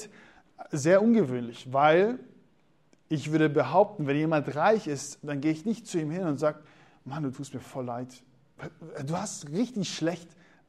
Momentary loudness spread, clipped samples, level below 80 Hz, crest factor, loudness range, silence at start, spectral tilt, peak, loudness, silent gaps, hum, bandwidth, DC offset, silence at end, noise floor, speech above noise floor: 18 LU; under 0.1%; -72 dBFS; 20 dB; 9 LU; 0 s; -6 dB/octave; -8 dBFS; -28 LUFS; none; none; 13 kHz; under 0.1%; 0.45 s; -66 dBFS; 39 dB